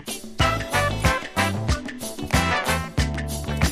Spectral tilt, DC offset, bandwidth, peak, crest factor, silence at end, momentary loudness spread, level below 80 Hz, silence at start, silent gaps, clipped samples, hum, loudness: -4.5 dB/octave; under 0.1%; 15.5 kHz; -6 dBFS; 18 dB; 0 s; 7 LU; -32 dBFS; 0 s; none; under 0.1%; none; -24 LUFS